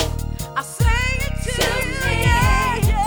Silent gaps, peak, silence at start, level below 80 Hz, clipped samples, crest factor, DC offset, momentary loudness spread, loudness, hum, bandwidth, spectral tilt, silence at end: none; -4 dBFS; 0 s; -24 dBFS; under 0.1%; 14 dB; under 0.1%; 10 LU; -20 LUFS; none; over 20 kHz; -4.5 dB/octave; 0 s